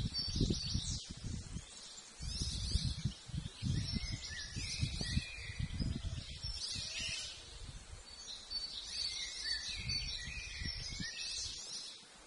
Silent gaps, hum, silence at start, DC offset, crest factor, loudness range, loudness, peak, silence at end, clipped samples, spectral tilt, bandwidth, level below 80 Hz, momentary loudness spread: none; none; 0 s; under 0.1%; 22 dB; 2 LU; -40 LUFS; -20 dBFS; 0 s; under 0.1%; -3 dB/octave; 11.5 kHz; -48 dBFS; 11 LU